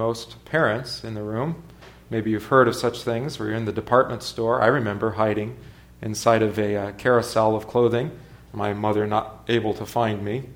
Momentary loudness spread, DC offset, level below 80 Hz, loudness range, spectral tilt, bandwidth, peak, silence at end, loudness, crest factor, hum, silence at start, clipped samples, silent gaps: 11 LU; under 0.1%; -52 dBFS; 2 LU; -6 dB/octave; 19.5 kHz; -2 dBFS; 0 s; -23 LUFS; 20 dB; none; 0 s; under 0.1%; none